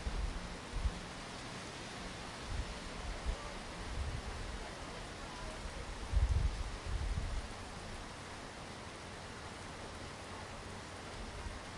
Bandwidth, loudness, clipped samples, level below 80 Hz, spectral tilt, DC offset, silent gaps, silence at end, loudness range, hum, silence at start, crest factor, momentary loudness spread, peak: 11.5 kHz; -44 LUFS; under 0.1%; -44 dBFS; -4.5 dB/octave; under 0.1%; none; 0 s; 6 LU; none; 0 s; 20 dB; 7 LU; -22 dBFS